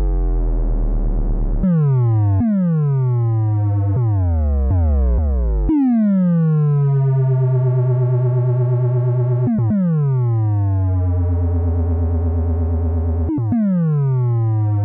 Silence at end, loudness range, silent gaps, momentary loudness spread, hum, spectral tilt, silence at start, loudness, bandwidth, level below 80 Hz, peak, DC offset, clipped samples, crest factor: 0 s; 2 LU; none; 4 LU; none; -13.5 dB/octave; 0 s; -18 LUFS; 2.6 kHz; -22 dBFS; -8 dBFS; under 0.1%; under 0.1%; 6 dB